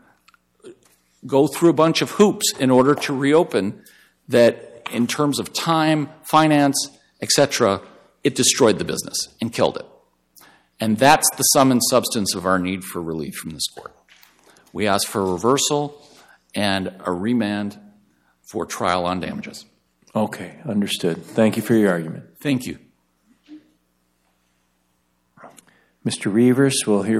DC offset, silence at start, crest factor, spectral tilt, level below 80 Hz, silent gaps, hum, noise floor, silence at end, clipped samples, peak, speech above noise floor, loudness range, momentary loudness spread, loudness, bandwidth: under 0.1%; 0.65 s; 18 dB; -4 dB/octave; -60 dBFS; none; 60 Hz at -55 dBFS; -67 dBFS; 0 s; under 0.1%; -2 dBFS; 48 dB; 7 LU; 14 LU; -19 LUFS; 16 kHz